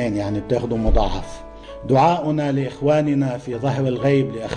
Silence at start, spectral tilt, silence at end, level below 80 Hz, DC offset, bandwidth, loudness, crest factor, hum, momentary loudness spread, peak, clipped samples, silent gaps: 0 s; -7.5 dB/octave; 0 s; -28 dBFS; under 0.1%; 9.8 kHz; -20 LUFS; 14 dB; none; 14 LU; -6 dBFS; under 0.1%; none